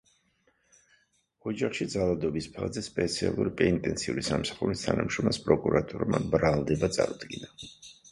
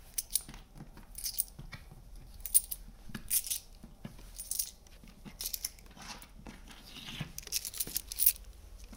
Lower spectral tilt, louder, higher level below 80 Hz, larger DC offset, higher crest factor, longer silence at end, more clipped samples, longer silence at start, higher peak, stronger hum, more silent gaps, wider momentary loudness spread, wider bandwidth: first, -5.5 dB/octave vs -0.5 dB/octave; first, -29 LUFS vs -33 LUFS; about the same, -50 dBFS vs -54 dBFS; neither; second, 22 dB vs 32 dB; about the same, 0.05 s vs 0 s; neither; first, 1.45 s vs 0 s; about the same, -6 dBFS vs -6 dBFS; neither; neither; second, 14 LU vs 25 LU; second, 11.5 kHz vs 18 kHz